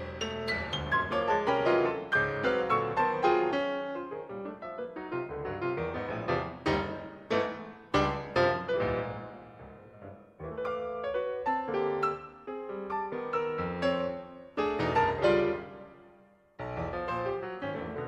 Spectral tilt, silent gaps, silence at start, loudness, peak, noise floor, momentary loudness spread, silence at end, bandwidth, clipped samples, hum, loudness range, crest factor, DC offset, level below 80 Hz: -6 dB/octave; none; 0 s; -31 LUFS; -14 dBFS; -60 dBFS; 15 LU; 0 s; 9.4 kHz; under 0.1%; none; 6 LU; 18 dB; under 0.1%; -54 dBFS